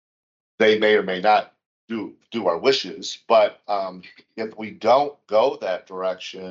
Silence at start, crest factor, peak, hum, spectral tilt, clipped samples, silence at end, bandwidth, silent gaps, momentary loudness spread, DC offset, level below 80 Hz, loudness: 0.6 s; 18 dB; -4 dBFS; none; -4 dB/octave; under 0.1%; 0 s; 7.6 kHz; 1.66-1.88 s; 14 LU; under 0.1%; -78 dBFS; -21 LUFS